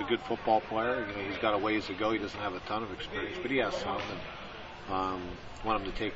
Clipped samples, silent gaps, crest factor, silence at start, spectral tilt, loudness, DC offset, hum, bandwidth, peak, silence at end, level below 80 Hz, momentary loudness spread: under 0.1%; none; 20 dB; 0 s; -5.5 dB/octave; -33 LUFS; under 0.1%; none; 8 kHz; -14 dBFS; 0 s; -52 dBFS; 11 LU